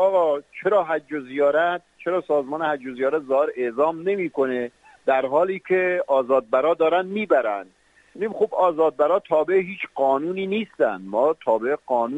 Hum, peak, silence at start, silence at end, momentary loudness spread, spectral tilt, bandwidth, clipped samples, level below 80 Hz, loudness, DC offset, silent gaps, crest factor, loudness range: none; -6 dBFS; 0 s; 0 s; 7 LU; -7 dB/octave; 8 kHz; under 0.1%; -70 dBFS; -22 LUFS; under 0.1%; none; 16 dB; 2 LU